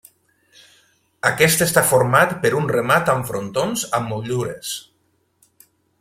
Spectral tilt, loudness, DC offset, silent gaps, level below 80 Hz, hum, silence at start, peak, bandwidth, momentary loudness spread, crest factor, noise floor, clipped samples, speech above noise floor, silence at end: -4 dB/octave; -18 LUFS; under 0.1%; none; -54 dBFS; none; 1.25 s; 0 dBFS; 16.5 kHz; 10 LU; 20 dB; -65 dBFS; under 0.1%; 47 dB; 1.2 s